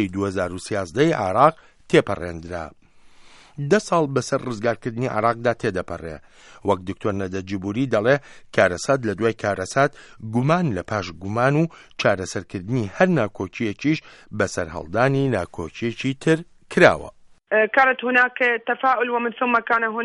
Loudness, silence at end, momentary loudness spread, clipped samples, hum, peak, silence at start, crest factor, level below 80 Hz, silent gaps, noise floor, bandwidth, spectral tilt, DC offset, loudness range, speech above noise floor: -22 LUFS; 0 s; 12 LU; under 0.1%; none; 0 dBFS; 0 s; 22 dB; -52 dBFS; none; -48 dBFS; 11.5 kHz; -6 dB/octave; under 0.1%; 5 LU; 26 dB